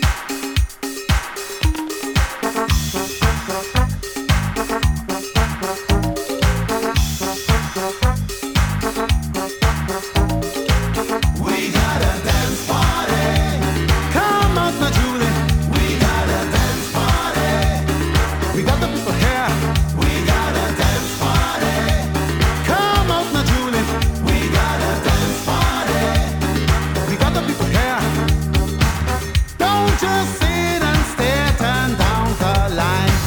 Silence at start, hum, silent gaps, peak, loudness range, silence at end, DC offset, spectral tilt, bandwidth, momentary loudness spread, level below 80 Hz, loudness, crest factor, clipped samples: 0 s; none; none; -2 dBFS; 3 LU; 0 s; under 0.1%; -5 dB/octave; over 20 kHz; 4 LU; -24 dBFS; -18 LUFS; 16 dB; under 0.1%